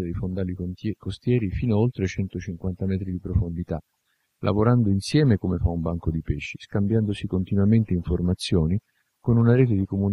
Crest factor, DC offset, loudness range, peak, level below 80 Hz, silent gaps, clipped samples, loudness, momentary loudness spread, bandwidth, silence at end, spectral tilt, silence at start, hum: 18 dB; under 0.1%; 4 LU; -6 dBFS; -38 dBFS; none; under 0.1%; -24 LUFS; 10 LU; 11.5 kHz; 0 s; -8 dB/octave; 0 s; none